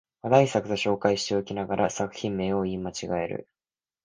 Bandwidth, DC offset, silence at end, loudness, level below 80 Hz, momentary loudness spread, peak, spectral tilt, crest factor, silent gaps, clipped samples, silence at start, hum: 10 kHz; under 0.1%; 0.6 s; -26 LUFS; -56 dBFS; 9 LU; -4 dBFS; -5 dB/octave; 22 dB; none; under 0.1%; 0.25 s; none